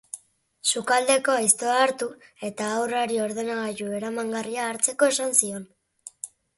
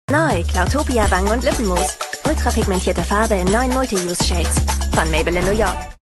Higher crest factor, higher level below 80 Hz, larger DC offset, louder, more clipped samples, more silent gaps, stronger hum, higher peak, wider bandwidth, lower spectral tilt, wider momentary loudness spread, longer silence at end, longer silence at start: first, 22 dB vs 16 dB; second, -72 dBFS vs -24 dBFS; neither; second, -24 LUFS vs -18 LUFS; neither; neither; neither; second, -4 dBFS vs 0 dBFS; about the same, 12 kHz vs 12.5 kHz; second, -1.5 dB/octave vs -4.5 dB/octave; first, 17 LU vs 3 LU; first, 0.3 s vs 0.15 s; about the same, 0.15 s vs 0.1 s